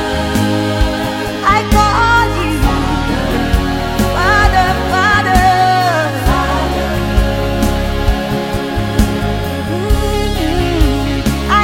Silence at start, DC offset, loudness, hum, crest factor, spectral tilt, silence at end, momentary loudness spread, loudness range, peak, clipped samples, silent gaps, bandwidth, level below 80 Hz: 0 s; under 0.1%; -14 LUFS; none; 12 dB; -5.5 dB/octave; 0 s; 7 LU; 4 LU; 0 dBFS; under 0.1%; none; 16.5 kHz; -18 dBFS